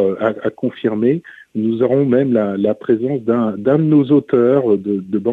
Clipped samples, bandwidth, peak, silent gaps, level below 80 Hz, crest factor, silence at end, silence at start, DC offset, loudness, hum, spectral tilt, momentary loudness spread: under 0.1%; 4.1 kHz; 0 dBFS; none; -60 dBFS; 14 dB; 0 s; 0 s; under 0.1%; -16 LUFS; none; -10.5 dB/octave; 7 LU